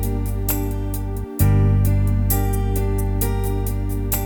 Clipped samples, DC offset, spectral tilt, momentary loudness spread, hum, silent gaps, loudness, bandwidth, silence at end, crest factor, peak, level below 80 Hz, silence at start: under 0.1%; under 0.1%; -6.5 dB/octave; 8 LU; 50 Hz at -30 dBFS; none; -21 LUFS; 19.5 kHz; 0 s; 14 dB; -6 dBFS; -24 dBFS; 0 s